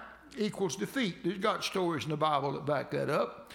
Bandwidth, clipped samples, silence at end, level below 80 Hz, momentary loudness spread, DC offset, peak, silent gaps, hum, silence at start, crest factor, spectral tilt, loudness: 17 kHz; under 0.1%; 0 s; -68 dBFS; 4 LU; under 0.1%; -16 dBFS; none; none; 0 s; 18 dB; -5 dB/octave; -32 LUFS